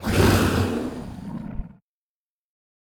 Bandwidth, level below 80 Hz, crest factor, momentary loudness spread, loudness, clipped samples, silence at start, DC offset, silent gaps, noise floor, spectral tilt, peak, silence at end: 20 kHz; -36 dBFS; 18 dB; 19 LU; -22 LUFS; under 0.1%; 0 s; under 0.1%; none; under -90 dBFS; -5.5 dB/octave; -8 dBFS; 1.25 s